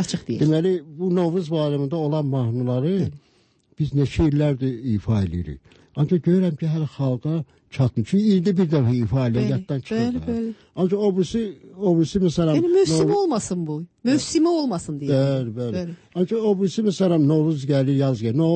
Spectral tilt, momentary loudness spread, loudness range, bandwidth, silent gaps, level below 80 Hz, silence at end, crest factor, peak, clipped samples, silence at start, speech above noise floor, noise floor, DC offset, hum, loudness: -7.5 dB/octave; 8 LU; 3 LU; 8.8 kHz; none; -46 dBFS; 0 s; 12 dB; -8 dBFS; under 0.1%; 0 s; 40 dB; -60 dBFS; under 0.1%; none; -22 LUFS